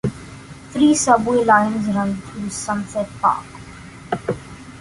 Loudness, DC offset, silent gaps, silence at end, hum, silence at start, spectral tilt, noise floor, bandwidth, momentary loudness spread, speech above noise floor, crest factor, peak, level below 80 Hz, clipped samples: -19 LUFS; under 0.1%; none; 0 s; none; 0.05 s; -4.5 dB/octave; -38 dBFS; 11.5 kHz; 23 LU; 20 dB; 18 dB; -2 dBFS; -48 dBFS; under 0.1%